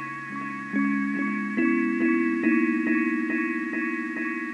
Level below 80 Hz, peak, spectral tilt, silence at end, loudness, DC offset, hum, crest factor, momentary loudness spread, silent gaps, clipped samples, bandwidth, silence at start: -74 dBFS; -12 dBFS; -7 dB/octave; 0 s; -25 LUFS; under 0.1%; none; 14 dB; 6 LU; none; under 0.1%; 9.8 kHz; 0 s